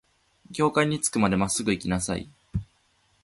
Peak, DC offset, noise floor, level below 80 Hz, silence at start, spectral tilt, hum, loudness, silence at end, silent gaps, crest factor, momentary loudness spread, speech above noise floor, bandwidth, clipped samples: -8 dBFS; under 0.1%; -66 dBFS; -48 dBFS; 0.5 s; -4.5 dB/octave; none; -26 LUFS; 0.6 s; none; 20 dB; 12 LU; 41 dB; 12 kHz; under 0.1%